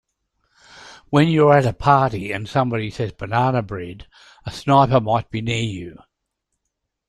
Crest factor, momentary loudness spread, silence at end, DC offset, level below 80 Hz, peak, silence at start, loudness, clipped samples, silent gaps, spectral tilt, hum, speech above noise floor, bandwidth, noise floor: 18 dB; 17 LU; 1.15 s; under 0.1%; -48 dBFS; -2 dBFS; 0.75 s; -19 LUFS; under 0.1%; none; -7 dB/octave; none; 59 dB; 11.5 kHz; -78 dBFS